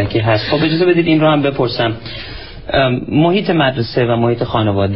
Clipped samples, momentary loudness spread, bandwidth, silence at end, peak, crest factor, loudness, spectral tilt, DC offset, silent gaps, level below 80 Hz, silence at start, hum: under 0.1%; 10 LU; 5.8 kHz; 0 s; 0 dBFS; 14 dB; -14 LUFS; -10.5 dB/octave; 1%; none; -38 dBFS; 0 s; none